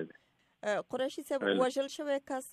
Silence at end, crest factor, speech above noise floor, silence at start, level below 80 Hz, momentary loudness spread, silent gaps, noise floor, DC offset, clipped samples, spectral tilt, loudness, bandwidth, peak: 0 s; 18 dB; 34 dB; 0 s; -82 dBFS; 7 LU; none; -68 dBFS; under 0.1%; under 0.1%; -4 dB/octave; -34 LUFS; 15 kHz; -16 dBFS